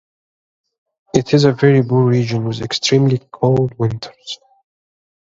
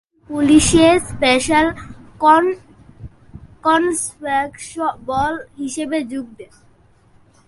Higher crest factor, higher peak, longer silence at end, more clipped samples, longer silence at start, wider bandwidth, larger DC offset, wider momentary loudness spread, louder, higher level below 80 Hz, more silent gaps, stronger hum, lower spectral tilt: about the same, 16 dB vs 18 dB; about the same, 0 dBFS vs 0 dBFS; second, 0.9 s vs 1.05 s; neither; first, 1.15 s vs 0.3 s; second, 7.8 kHz vs 11.5 kHz; neither; about the same, 16 LU vs 15 LU; about the same, -15 LUFS vs -17 LUFS; second, -52 dBFS vs -40 dBFS; neither; neither; first, -6.5 dB/octave vs -4 dB/octave